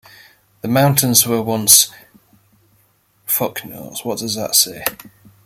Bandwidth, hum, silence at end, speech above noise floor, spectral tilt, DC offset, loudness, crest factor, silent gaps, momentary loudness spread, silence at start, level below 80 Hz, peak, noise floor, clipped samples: 17 kHz; none; 0.5 s; 42 dB; -2.5 dB/octave; under 0.1%; -14 LUFS; 18 dB; none; 19 LU; 0.65 s; -58 dBFS; 0 dBFS; -58 dBFS; under 0.1%